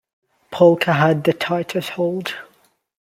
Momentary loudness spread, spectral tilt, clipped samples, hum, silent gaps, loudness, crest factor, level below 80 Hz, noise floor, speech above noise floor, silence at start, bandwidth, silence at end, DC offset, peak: 15 LU; -6.5 dB/octave; under 0.1%; none; none; -18 LUFS; 18 dB; -62 dBFS; -59 dBFS; 41 dB; 0.5 s; 16 kHz; 0.65 s; under 0.1%; -2 dBFS